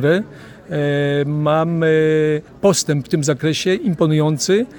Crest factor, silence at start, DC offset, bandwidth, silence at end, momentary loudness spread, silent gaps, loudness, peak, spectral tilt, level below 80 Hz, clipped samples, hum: 16 dB; 0 s; under 0.1%; 18 kHz; 0 s; 5 LU; none; -17 LUFS; -2 dBFS; -5.5 dB/octave; -54 dBFS; under 0.1%; none